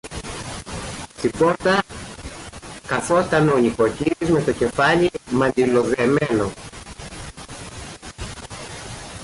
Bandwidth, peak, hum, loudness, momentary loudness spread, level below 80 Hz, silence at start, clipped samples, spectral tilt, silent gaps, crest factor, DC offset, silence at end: 11.5 kHz; -6 dBFS; none; -20 LUFS; 18 LU; -44 dBFS; 0.05 s; under 0.1%; -5.5 dB/octave; none; 14 dB; under 0.1%; 0 s